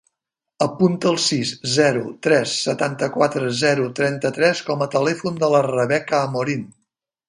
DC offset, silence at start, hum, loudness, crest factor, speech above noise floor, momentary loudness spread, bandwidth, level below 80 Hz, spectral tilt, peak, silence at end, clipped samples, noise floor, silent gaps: under 0.1%; 0.6 s; none; -20 LUFS; 18 dB; 64 dB; 5 LU; 11.5 kHz; -64 dBFS; -4.5 dB/octave; -2 dBFS; 0.6 s; under 0.1%; -83 dBFS; none